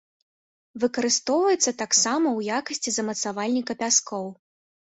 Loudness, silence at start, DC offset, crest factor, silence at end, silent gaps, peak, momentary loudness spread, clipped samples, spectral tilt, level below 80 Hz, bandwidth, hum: -23 LUFS; 0.75 s; under 0.1%; 20 dB; 0.6 s; none; -6 dBFS; 8 LU; under 0.1%; -1.5 dB/octave; -70 dBFS; 8.4 kHz; none